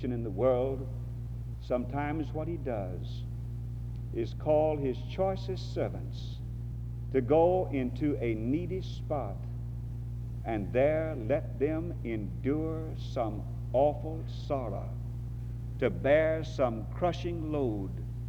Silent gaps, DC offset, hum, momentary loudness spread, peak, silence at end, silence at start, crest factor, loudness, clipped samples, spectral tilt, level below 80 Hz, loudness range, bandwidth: none; under 0.1%; none; 12 LU; -12 dBFS; 0 s; 0 s; 18 dB; -33 LUFS; under 0.1%; -8.5 dB/octave; -42 dBFS; 3 LU; 7.6 kHz